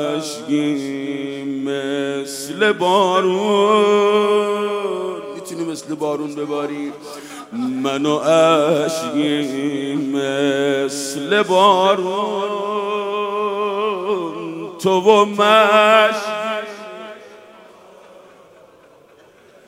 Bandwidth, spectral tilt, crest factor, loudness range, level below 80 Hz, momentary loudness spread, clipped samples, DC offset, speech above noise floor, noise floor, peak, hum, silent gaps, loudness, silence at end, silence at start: 16 kHz; -4 dB/octave; 18 dB; 7 LU; -70 dBFS; 14 LU; under 0.1%; under 0.1%; 32 dB; -48 dBFS; 0 dBFS; none; none; -18 LUFS; 1.5 s; 0 s